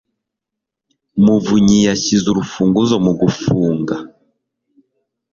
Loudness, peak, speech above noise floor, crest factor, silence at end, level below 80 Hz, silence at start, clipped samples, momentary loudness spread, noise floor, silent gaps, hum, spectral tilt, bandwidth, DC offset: -15 LUFS; -2 dBFS; 68 dB; 14 dB; 1.25 s; -46 dBFS; 1.15 s; under 0.1%; 8 LU; -82 dBFS; none; none; -5.5 dB/octave; 7.4 kHz; under 0.1%